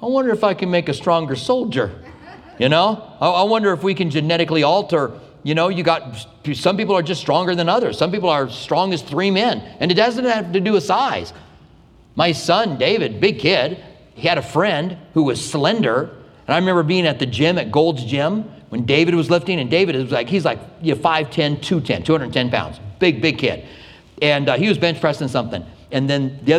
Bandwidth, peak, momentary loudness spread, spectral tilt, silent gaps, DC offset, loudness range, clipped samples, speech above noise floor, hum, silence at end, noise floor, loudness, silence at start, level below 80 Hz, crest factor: 13 kHz; 0 dBFS; 7 LU; -5.5 dB/octave; none; under 0.1%; 2 LU; under 0.1%; 30 dB; none; 0 s; -48 dBFS; -18 LUFS; 0 s; -52 dBFS; 18 dB